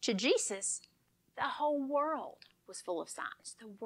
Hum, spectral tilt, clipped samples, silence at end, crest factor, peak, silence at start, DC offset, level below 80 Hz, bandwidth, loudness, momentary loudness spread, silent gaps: none; -2.5 dB/octave; under 0.1%; 0 s; 18 dB; -18 dBFS; 0 s; under 0.1%; -86 dBFS; 14.5 kHz; -35 LUFS; 18 LU; none